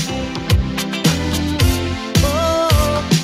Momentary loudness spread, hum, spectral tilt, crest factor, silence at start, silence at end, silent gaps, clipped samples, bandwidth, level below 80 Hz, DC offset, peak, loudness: 6 LU; none; -5 dB/octave; 16 dB; 0 s; 0 s; none; under 0.1%; 16 kHz; -24 dBFS; under 0.1%; -2 dBFS; -17 LUFS